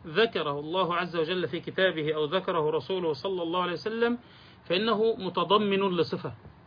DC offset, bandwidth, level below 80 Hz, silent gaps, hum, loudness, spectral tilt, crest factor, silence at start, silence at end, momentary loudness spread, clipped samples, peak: under 0.1%; 5.2 kHz; -66 dBFS; none; none; -28 LUFS; -7 dB/octave; 18 dB; 0 s; 0.2 s; 6 LU; under 0.1%; -12 dBFS